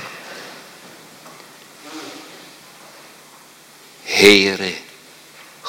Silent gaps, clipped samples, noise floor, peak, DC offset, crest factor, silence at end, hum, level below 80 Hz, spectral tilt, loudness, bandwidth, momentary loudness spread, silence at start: none; under 0.1%; -45 dBFS; 0 dBFS; under 0.1%; 22 dB; 0 s; none; -56 dBFS; -2.5 dB/octave; -13 LUFS; 16.5 kHz; 30 LU; 0 s